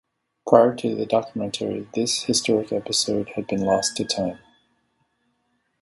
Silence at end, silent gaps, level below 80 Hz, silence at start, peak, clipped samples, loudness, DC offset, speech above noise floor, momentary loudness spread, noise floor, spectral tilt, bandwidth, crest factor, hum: 1.45 s; none; -60 dBFS; 0.45 s; 0 dBFS; under 0.1%; -22 LUFS; under 0.1%; 49 dB; 11 LU; -71 dBFS; -3.5 dB/octave; 11.5 kHz; 24 dB; none